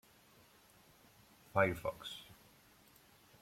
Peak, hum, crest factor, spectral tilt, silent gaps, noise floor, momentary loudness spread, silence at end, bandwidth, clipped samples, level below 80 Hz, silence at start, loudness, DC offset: -16 dBFS; none; 26 dB; -5.5 dB/octave; none; -66 dBFS; 24 LU; 1.1 s; 16.5 kHz; under 0.1%; -68 dBFS; 1.55 s; -38 LUFS; under 0.1%